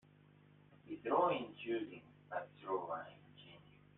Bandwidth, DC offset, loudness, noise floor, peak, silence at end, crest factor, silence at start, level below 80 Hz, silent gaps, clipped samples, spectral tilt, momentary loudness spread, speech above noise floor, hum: 4 kHz; under 0.1%; -41 LUFS; -66 dBFS; -22 dBFS; 0.35 s; 22 dB; 0.7 s; -82 dBFS; none; under 0.1%; -4 dB/octave; 24 LU; 26 dB; 50 Hz at -65 dBFS